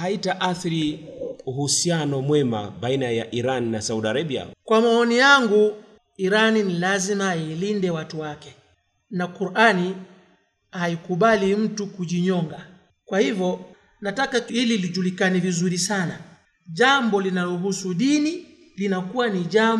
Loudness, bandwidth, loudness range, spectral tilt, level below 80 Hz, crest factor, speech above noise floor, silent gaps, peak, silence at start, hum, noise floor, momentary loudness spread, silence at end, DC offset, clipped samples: -22 LUFS; 12.5 kHz; 5 LU; -4.5 dB/octave; -64 dBFS; 18 dB; 42 dB; none; -4 dBFS; 0 s; none; -63 dBFS; 13 LU; 0 s; under 0.1%; under 0.1%